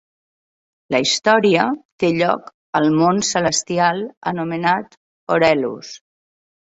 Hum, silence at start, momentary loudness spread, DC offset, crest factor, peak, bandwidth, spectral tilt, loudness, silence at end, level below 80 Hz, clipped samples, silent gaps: none; 0.9 s; 10 LU; under 0.1%; 18 dB; -2 dBFS; 8.2 kHz; -4 dB/octave; -18 LUFS; 0.7 s; -58 dBFS; under 0.1%; 1.85-1.98 s, 2.54-2.73 s, 4.17-4.21 s, 4.97-5.27 s